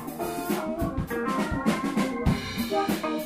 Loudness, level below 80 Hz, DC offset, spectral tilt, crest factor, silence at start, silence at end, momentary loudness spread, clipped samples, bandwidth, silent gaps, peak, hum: -28 LUFS; -40 dBFS; under 0.1%; -5.5 dB/octave; 18 dB; 0 s; 0 s; 4 LU; under 0.1%; 16 kHz; none; -10 dBFS; none